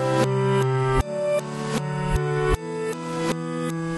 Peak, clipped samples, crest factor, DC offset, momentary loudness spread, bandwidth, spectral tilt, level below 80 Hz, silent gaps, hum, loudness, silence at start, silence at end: -8 dBFS; under 0.1%; 16 dB; under 0.1%; 6 LU; 12 kHz; -6.5 dB/octave; -36 dBFS; none; none; -24 LUFS; 0 s; 0 s